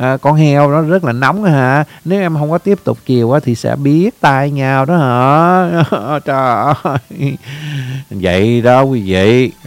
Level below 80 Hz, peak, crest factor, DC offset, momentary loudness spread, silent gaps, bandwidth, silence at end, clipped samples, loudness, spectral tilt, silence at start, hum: -48 dBFS; 0 dBFS; 12 dB; under 0.1%; 9 LU; none; 16 kHz; 0.15 s; 0.2%; -12 LUFS; -7.5 dB/octave; 0 s; none